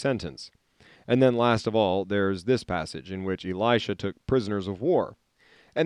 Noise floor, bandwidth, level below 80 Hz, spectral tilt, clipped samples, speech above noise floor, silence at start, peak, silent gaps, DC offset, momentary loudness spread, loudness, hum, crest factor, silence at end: -60 dBFS; 11 kHz; -56 dBFS; -6.5 dB/octave; under 0.1%; 34 dB; 0 s; -8 dBFS; none; under 0.1%; 12 LU; -26 LUFS; none; 18 dB; 0 s